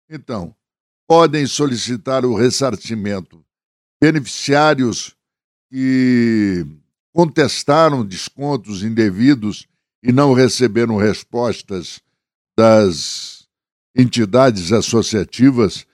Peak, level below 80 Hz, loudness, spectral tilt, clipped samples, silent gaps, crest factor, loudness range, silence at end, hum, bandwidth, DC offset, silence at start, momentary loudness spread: 0 dBFS; -52 dBFS; -15 LUFS; -5.5 dB/octave; under 0.1%; 0.80-1.07 s, 3.65-4.00 s, 5.44-5.69 s, 7.00-7.13 s, 9.95-10.02 s, 12.35-12.45 s, 13.72-13.94 s; 16 dB; 2 LU; 0.1 s; none; 12.5 kHz; under 0.1%; 0.1 s; 14 LU